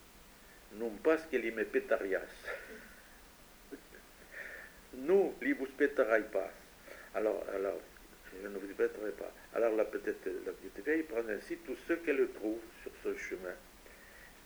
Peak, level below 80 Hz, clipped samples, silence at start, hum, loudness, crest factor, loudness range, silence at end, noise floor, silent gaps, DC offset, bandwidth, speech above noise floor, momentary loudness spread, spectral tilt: -16 dBFS; -64 dBFS; under 0.1%; 0 s; none; -36 LUFS; 22 dB; 5 LU; 0 s; -58 dBFS; none; under 0.1%; over 20 kHz; 22 dB; 23 LU; -5 dB/octave